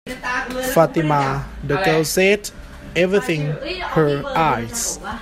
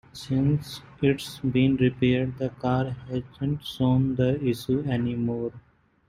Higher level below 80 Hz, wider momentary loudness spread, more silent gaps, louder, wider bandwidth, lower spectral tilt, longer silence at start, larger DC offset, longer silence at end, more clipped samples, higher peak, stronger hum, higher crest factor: first, -40 dBFS vs -52 dBFS; about the same, 8 LU vs 8 LU; neither; first, -19 LUFS vs -26 LUFS; about the same, 16 kHz vs 15 kHz; second, -4.5 dB/octave vs -7.5 dB/octave; about the same, 0.05 s vs 0.15 s; neither; second, 0 s vs 0.5 s; neither; first, 0 dBFS vs -10 dBFS; neither; about the same, 18 dB vs 16 dB